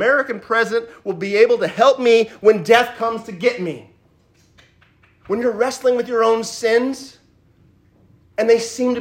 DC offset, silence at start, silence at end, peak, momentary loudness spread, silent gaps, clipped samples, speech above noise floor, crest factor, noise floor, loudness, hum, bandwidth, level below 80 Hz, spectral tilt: under 0.1%; 0 s; 0 s; 0 dBFS; 11 LU; none; under 0.1%; 39 dB; 18 dB; -56 dBFS; -17 LUFS; none; 15.5 kHz; -64 dBFS; -4 dB/octave